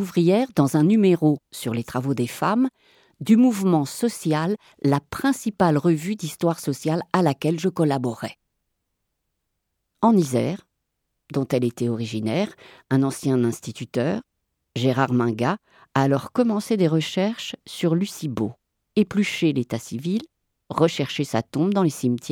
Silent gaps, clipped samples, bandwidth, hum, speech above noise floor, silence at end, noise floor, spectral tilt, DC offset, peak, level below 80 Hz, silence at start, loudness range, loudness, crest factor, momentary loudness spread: none; under 0.1%; 18 kHz; none; 56 dB; 0 s; -77 dBFS; -6.5 dB/octave; under 0.1%; -4 dBFS; -62 dBFS; 0 s; 4 LU; -23 LUFS; 20 dB; 10 LU